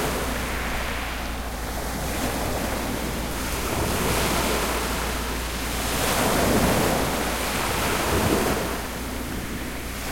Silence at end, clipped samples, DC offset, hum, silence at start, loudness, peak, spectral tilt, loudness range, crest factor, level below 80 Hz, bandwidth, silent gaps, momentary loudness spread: 0 s; under 0.1%; under 0.1%; none; 0 s; -25 LUFS; -8 dBFS; -3.5 dB/octave; 5 LU; 18 dB; -34 dBFS; 16.5 kHz; none; 9 LU